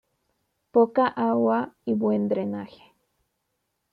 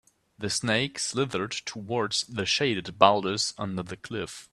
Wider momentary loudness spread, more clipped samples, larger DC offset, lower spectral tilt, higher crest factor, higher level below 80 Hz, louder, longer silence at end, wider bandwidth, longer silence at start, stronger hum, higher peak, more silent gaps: second, 10 LU vs 14 LU; neither; neither; first, -9.5 dB/octave vs -3.5 dB/octave; second, 18 dB vs 26 dB; second, -72 dBFS vs -62 dBFS; first, -24 LUFS vs -27 LUFS; first, 1.25 s vs 0.1 s; second, 5 kHz vs 13 kHz; first, 0.75 s vs 0.4 s; neither; second, -8 dBFS vs -2 dBFS; neither